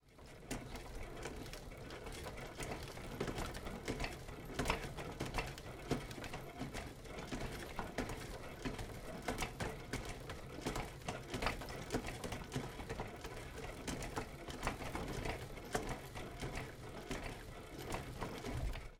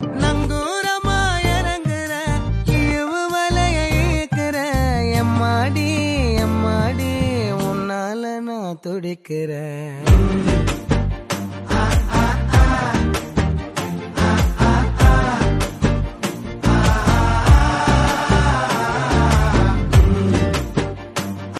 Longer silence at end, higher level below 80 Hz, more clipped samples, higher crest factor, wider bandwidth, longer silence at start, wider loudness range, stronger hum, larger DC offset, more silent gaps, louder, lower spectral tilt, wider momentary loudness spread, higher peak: about the same, 0 s vs 0 s; second, -52 dBFS vs -22 dBFS; neither; first, 26 dB vs 16 dB; first, 17.5 kHz vs 13.5 kHz; about the same, 0.05 s vs 0 s; second, 2 LU vs 5 LU; neither; neither; neither; second, -45 LUFS vs -19 LUFS; second, -4.5 dB/octave vs -6 dB/octave; second, 7 LU vs 10 LU; second, -18 dBFS vs -2 dBFS